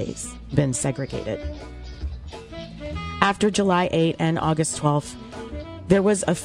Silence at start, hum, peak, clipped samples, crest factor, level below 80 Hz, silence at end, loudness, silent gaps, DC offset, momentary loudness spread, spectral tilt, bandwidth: 0 s; none; -2 dBFS; under 0.1%; 22 dB; -40 dBFS; 0 s; -23 LUFS; none; under 0.1%; 17 LU; -5 dB/octave; 12 kHz